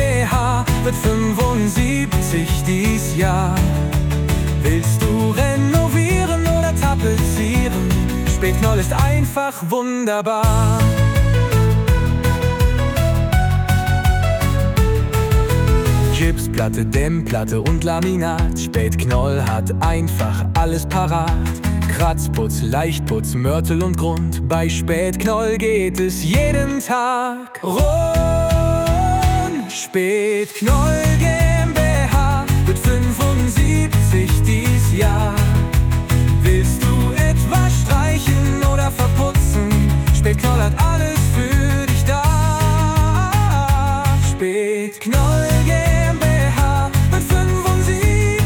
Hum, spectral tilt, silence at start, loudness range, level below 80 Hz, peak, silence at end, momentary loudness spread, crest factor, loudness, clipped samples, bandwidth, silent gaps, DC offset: none; -6 dB/octave; 0 s; 3 LU; -22 dBFS; -4 dBFS; 0 s; 4 LU; 12 dB; -17 LUFS; under 0.1%; 19.5 kHz; none; under 0.1%